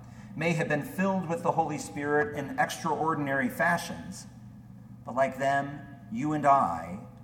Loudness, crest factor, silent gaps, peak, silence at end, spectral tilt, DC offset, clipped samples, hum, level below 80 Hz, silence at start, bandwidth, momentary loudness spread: -29 LUFS; 18 dB; none; -12 dBFS; 0 s; -5.5 dB/octave; under 0.1%; under 0.1%; none; -60 dBFS; 0 s; 18 kHz; 18 LU